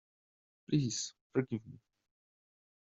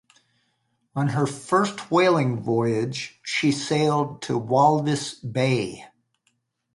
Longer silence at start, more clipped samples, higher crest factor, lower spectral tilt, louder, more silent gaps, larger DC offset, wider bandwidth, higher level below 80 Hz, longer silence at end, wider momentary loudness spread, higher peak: second, 0.7 s vs 0.95 s; neither; about the same, 22 dB vs 18 dB; about the same, -6.5 dB/octave vs -5.5 dB/octave; second, -36 LUFS vs -23 LUFS; first, 1.21-1.30 s vs none; neither; second, 8 kHz vs 11.5 kHz; second, -72 dBFS vs -64 dBFS; first, 1.2 s vs 0.9 s; about the same, 9 LU vs 10 LU; second, -18 dBFS vs -6 dBFS